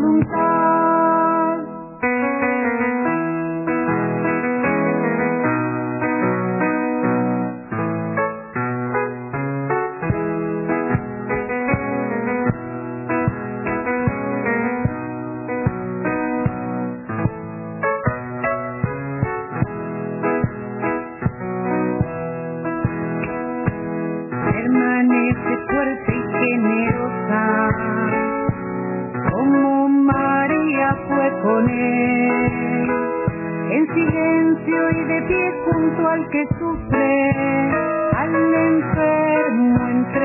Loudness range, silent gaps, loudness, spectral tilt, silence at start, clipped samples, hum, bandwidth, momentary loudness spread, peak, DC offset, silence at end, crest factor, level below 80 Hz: 6 LU; none; -20 LUFS; -12 dB/octave; 0 s; under 0.1%; none; 2.9 kHz; 8 LU; -4 dBFS; under 0.1%; 0 s; 16 dB; -44 dBFS